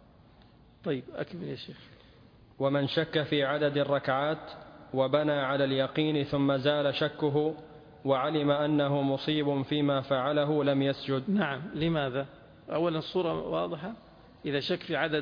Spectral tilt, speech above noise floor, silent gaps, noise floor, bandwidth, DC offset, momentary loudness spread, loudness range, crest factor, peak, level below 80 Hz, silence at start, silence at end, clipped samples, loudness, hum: -8 dB/octave; 28 dB; none; -57 dBFS; 5.2 kHz; under 0.1%; 12 LU; 4 LU; 16 dB; -12 dBFS; -62 dBFS; 0.85 s; 0 s; under 0.1%; -29 LUFS; none